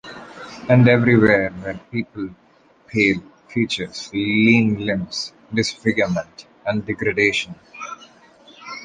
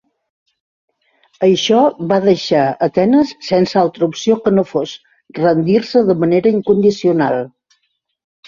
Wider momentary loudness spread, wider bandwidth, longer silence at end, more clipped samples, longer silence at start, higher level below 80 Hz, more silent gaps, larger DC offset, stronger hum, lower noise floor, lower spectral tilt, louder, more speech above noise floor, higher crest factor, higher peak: first, 20 LU vs 7 LU; first, 9.4 kHz vs 7.4 kHz; second, 0 s vs 1 s; neither; second, 0.05 s vs 1.4 s; first, -50 dBFS vs -56 dBFS; neither; neither; neither; second, -49 dBFS vs -67 dBFS; about the same, -6 dB/octave vs -6 dB/octave; second, -19 LUFS vs -14 LUFS; second, 30 dB vs 54 dB; about the same, 18 dB vs 14 dB; about the same, -2 dBFS vs 0 dBFS